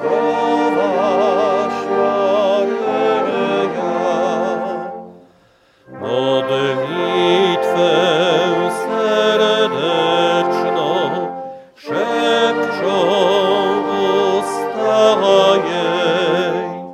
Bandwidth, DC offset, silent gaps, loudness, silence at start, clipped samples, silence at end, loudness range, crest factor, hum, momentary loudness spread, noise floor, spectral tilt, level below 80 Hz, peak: 14 kHz; under 0.1%; none; -16 LUFS; 0 s; under 0.1%; 0 s; 5 LU; 16 dB; none; 7 LU; -53 dBFS; -5 dB/octave; -68 dBFS; 0 dBFS